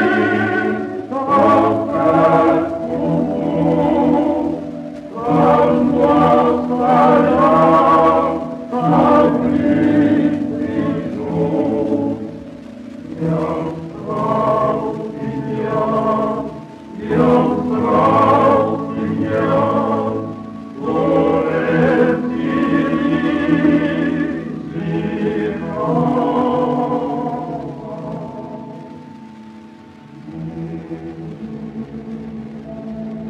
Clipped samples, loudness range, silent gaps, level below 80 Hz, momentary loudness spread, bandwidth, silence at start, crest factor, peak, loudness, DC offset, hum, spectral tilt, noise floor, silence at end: under 0.1%; 16 LU; none; -48 dBFS; 17 LU; 9.4 kHz; 0 s; 16 dB; 0 dBFS; -16 LUFS; under 0.1%; none; -8.5 dB/octave; -39 dBFS; 0 s